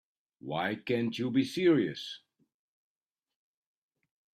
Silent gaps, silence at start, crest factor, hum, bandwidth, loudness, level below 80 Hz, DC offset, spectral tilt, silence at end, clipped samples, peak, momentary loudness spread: none; 0.45 s; 20 dB; none; 13 kHz; -30 LUFS; -76 dBFS; under 0.1%; -6 dB/octave; 2.15 s; under 0.1%; -14 dBFS; 16 LU